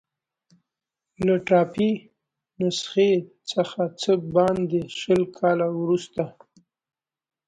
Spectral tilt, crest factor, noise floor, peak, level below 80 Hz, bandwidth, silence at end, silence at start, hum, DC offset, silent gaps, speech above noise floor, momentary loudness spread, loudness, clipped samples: -6 dB/octave; 18 dB; -86 dBFS; -6 dBFS; -60 dBFS; 10.5 kHz; 1.2 s; 1.2 s; none; under 0.1%; none; 64 dB; 8 LU; -23 LUFS; under 0.1%